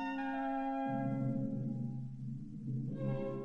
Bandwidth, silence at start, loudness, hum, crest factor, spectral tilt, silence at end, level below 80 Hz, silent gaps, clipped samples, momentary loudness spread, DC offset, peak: 5.8 kHz; 0 s; -39 LUFS; none; 12 dB; -9.5 dB/octave; 0 s; -62 dBFS; none; under 0.1%; 8 LU; under 0.1%; -26 dBFS